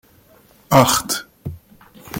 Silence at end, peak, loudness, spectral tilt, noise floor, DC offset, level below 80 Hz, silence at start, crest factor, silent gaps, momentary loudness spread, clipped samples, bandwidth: 0 s; 0 dBFS; -16 LUFS; -4 dB/octave; -51 dBFS; under 0.1%; -48 dBFS; 0.7 s; 20 dB; none; 21 LU; under 0.1%; 17 kHz